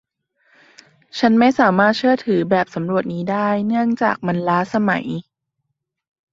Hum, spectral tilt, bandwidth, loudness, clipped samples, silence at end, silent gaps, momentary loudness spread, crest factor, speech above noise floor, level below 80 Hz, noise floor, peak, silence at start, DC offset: none; -7 dB/octave; 7.6 kHz; -18 LUFS; under 0.1%; 1.1 s; none; 8 LU; 18 dB; 59 dB; -60 dBFS; -76 dBFS; -2 dBFS; 1.15 s; under 0.1%